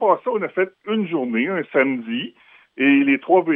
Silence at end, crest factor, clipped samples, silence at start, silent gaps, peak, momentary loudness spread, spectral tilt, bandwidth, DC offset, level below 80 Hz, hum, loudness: 0 s; 16 dB; under 0.1%; 0 s; none; -4 dBFS; 9 LU; -9 dB/octave; 3.7 kHz; under 0.1%; -80 dBFS; none; -20 LUFS